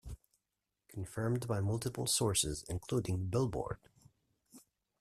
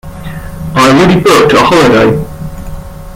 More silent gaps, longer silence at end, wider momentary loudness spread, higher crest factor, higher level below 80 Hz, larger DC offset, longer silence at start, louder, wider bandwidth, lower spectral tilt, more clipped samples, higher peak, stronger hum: neither; first, 0.4 s vs 0 s; second, 16 LU vs 19 LU; first, 18 dB vs 8 dB; second, -56 dBFS vs -28 dBFS; neither; about the same, 0.05 s vs 0.05 s; second, -36 LUFS vs -6 LUFS; second, 14.5 kHz vs 17 kHz; about the same, -4.5 dB/octave vs -5.5 dB/octave; second, under 0.1% vs 0.2%; second, -20 dBFS vs 0 dBFS; neither